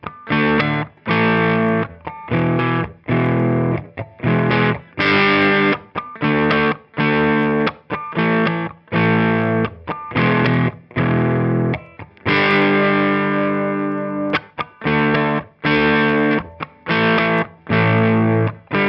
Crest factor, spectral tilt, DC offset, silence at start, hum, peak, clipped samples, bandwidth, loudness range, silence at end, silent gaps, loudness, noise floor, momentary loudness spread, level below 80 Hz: 18 dB; -9 dB/octave; under 0.1%; 0.05 s; none; 0 dBFS; under 0.1%; 6 kHz; 2 LU; 0 s; none; -17 LUFS; -37 dBFS; 9 LU; -48 dBFS